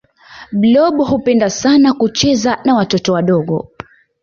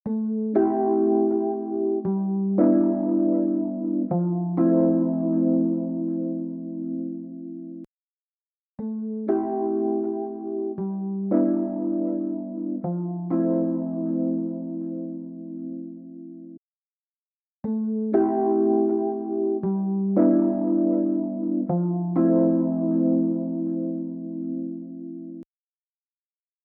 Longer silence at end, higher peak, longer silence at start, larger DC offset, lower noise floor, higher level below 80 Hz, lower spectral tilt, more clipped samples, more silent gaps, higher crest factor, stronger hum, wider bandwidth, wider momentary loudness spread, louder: second, 0.6 s vs 1.2 s; first, -2 dBFS vs -8 dBFS; first, 0.3 s vs 0.05 s; neither; second, -36 dBFS vs under -90 dBFS; first, -46 dBFS vs -68 dBFS; second, -5 dB/octave vs -13.5 dB/octave; neither; second, none vs 7.87-8.78 s, 16.58-17.63 s; about the same, 12 dB vs 16 dB; neither; first, 7.4 kHz vs 2.2 kHz; second, 8 LU vs 15 LU; first, -13 LUFS vs -24 LUFS